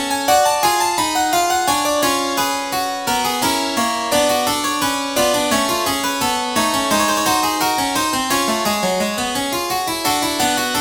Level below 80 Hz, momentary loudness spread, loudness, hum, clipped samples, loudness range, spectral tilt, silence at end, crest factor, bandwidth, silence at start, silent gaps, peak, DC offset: -48 dBFS; 4 LU; -17 LUFS; none; under 0.1%; 1 LU; -2 dB/octave; 0 s; 16 dB; over 20 kHz; 0 s; none; -2 dBFS; under 0.1%